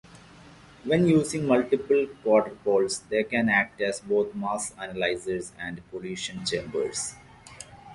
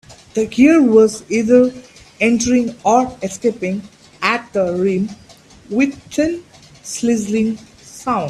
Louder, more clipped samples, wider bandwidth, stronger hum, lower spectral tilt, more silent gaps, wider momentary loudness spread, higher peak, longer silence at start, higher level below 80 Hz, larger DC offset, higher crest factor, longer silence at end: second, -26 LUFS vs -16 LUFS; neither; second, 11.5 kHz vs 13 kHz; neither; about the same, -4.5 dB/octave vs -5 dB/octave; neither; about the same, 13 LU vs 14 LU; second, -8 dBFS vs 0 dBFS; about the same, 0.15 s vs 0.1 s; second, -58 dBFS vs -50 dBFS; neither; about the same, 18 dB vs 16 dB; about the same, 0 s vs 0 s